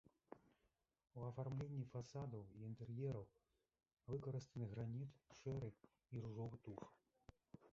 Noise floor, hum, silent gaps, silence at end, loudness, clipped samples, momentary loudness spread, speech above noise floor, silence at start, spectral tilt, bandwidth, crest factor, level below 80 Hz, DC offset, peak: -87 dBFS; none; none; 0 s; -52 LUFS; under 0.1%; 17 LU; 37 dB; 0.3 s; -9 dB/octave; 7.4 kHz; 16 dB; -74 dBFS; under 0.1%; -36 dBFS